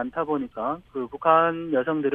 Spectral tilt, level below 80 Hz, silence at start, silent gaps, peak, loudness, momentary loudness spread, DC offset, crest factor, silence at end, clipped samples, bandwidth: -9 dB/octave; -60 dBFS; 0 s; none; -4 dBFS; -24 LUFS; 11 LU; under 0.1%; 20 dB; 0 s; under 0.1%; 3.8 kHz